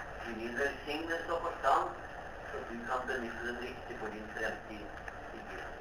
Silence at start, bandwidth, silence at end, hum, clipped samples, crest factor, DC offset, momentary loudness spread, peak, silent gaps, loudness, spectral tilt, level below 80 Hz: 0 s; over 20 kHz; 0 s; none; under 0.1%; 22 dB; under 0.1%; 13 LU; -16 dBFS; none; -38 LUFS; -4.5 dB/octave; -54 dBFS